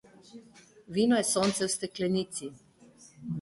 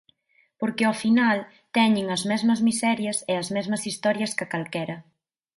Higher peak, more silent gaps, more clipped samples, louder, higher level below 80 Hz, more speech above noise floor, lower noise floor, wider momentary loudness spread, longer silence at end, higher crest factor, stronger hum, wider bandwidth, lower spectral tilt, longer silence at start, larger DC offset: second, -14 dBFS vs -8 dBFS; neither; neither; second, -29 LUFS vs -24 LUFS; about the same, -66 dBFS vs -70 dBFS; second, 28 dB vs 42 dB; second, -57 dBFS vs -66 dBFS; first, 14 LU vs 9 LU; second, 0 s vs 0.55 s; about the same, 16 dB vs 18 dB; neither; about the same, 12 kHz vs 11.5 kHz; about the same, -4 dB/octave vs -4 dB/octave; second, 0.35 s vs 0.6 s; neither